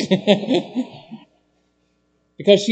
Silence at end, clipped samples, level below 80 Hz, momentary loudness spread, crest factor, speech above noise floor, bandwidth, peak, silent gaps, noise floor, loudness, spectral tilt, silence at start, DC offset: 0 s; under 0.1%; -68 dBFS; 22 LU; 20 dB; 47 dB; 8.8 kHz; 0 dBFS; none; -65 dBFS; -19 LUFS; -5.5 dB/octave; 0 s; under 0.1%